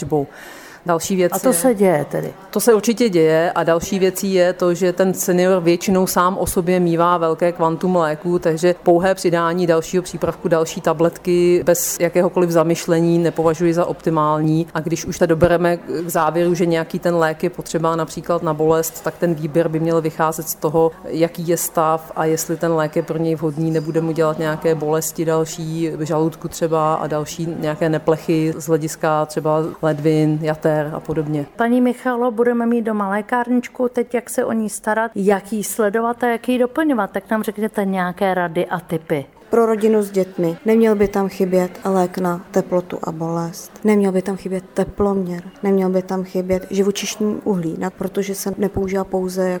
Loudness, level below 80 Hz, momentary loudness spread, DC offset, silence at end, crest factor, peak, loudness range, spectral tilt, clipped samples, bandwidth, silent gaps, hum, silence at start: -18 LUFS; -48 dBFS; 7 LU; under 0.1%; 0 s; 16 dB; -2 dBFS; 4 LU; -5.5 dB/octave; under 0.1%; 19.5 kHz; none; none; 0 s